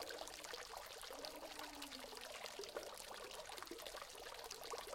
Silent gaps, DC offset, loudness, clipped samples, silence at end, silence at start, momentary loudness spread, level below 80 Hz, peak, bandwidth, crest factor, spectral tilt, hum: none; under 0.1%; -51 LUFS; under 0.1%; 0 s; 0 s; 2 LU; -72 dBFS; -28 dBFS; 16.5 kHz; 24 dB; -1 dB/octave; none